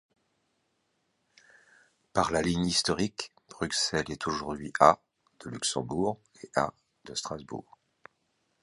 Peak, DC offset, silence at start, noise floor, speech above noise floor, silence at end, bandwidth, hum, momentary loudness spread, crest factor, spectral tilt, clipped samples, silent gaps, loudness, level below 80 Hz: -4 dBFS; under 0.1%; 2.15 s; -76 dBFS; 47 dB; 1 s; 11.5 kHz; none; 19 LU; 28 dB; -3.5 dB/octave; under 0.1%; none; -29 LUFS; -56 dBFS